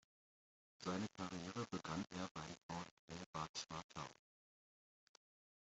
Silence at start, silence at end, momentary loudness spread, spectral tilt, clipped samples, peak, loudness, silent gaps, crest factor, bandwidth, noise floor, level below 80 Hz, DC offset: 0.8 s; 1.5 s; 8 LU; -4.5 dB/octave; under 0.1%; -32 dBFS; -49 LUFS; 2.31-2.35 s, 2.63-2.69 s, 2.91-3.08 s, 3.26-3.33 s, 3.49-3.54 s, 3.84-3.89 s; 20 dB; 8.2 kHz; under -90 dBFS; -78 dBFS; under 0.1%